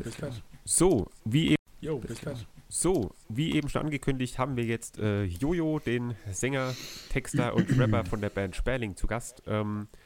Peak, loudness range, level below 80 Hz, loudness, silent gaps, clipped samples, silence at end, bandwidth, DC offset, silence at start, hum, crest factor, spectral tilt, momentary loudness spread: -10 dBFS; 2 LU; -42 dBFS; -30 LUFS; 1.59-1.66 s; under 0.1%; 0.1 s; 17 kHz; under 0.1%; 0 s; none; 20 dB; -5 dB/octave; 10 LU